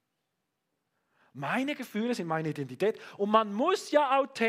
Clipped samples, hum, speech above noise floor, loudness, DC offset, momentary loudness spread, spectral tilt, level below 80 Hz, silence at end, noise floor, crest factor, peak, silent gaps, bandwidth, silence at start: under 0.1%; none; 53 dB; -29 LUFS; under 0.1%; 8 LU; -5.5 dB/octave; -80 dBFS; 0 s; -82 dBFS; 22 dB; -10 dBFS; none; 15.5 kHz; 1.35 s